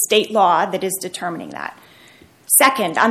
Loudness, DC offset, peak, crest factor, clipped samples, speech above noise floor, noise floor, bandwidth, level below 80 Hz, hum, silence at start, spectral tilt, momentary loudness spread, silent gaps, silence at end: -16 LUFS; under 0.1%; 0 dBFS; 18 dB; under 0.1%; 30 dB; -48 dBFS; 17 kHz; -66 dBFS; none; 0 s; -1.5 dB/octave; 17 LU; none; 0 s